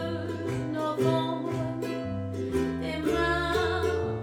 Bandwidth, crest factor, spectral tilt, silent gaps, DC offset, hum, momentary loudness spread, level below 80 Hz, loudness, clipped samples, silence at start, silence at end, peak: 17 kHz; 16 dB; -6.5 dB/octave; none; under 0.1%; none; 6 LU; -48 dBFS; -29 LUFS; under 0.1%; 0 s; 0 s; -12 dBFS